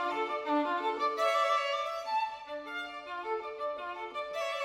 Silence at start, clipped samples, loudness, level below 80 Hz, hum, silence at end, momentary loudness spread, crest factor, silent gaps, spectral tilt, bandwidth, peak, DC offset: 0 s; under 0.1%; -33 LUFS; -74 dBFS; none; 0 s; 11 LU; 16 dB; none; -2 dB/octave; 16 kHz; -18 dBFS; under 0.1%